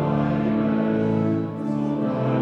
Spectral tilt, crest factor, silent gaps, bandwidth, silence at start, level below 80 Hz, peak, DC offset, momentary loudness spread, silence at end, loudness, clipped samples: -10 dB/octave; 12 dB; none; 5.8 kHz; 0 s; -50 dBFS; -10 dBFS; under 0.1%; 4 LU; 0 s; -23 LUFS; under 0.1%